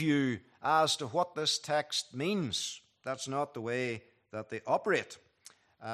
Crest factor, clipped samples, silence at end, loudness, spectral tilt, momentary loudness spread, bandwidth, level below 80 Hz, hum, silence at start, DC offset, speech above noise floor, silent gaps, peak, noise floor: 20 dB; under 0.1%; 0 s; -33 LUFS; -3.5 dB/octave; 15 LU; 14.5 kHz; -76 dBFS; none; 0 s; under 0.1%; 28 dB; none; -14 dBFS; -60 dBFS